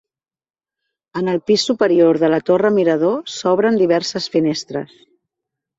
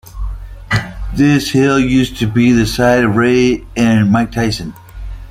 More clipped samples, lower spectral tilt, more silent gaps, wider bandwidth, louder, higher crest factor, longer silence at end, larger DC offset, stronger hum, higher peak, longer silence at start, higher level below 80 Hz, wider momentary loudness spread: neither; about the same, -5 dB/octave vs -6 dB/octave; neither; second, 8 kHz vs 16 kHz; second, -16 LUFS vs -13 LUFS; about the same, 16 dB vs 12 dB; first, 0.95 s vs 0 s; neither; neither; about the same, -2 dBFS vs -2 dBFS; first, 1.15 s vs 0.05 s; second, -62 dBFS vs -28 dBFS; second, 11 LU vs 16 LU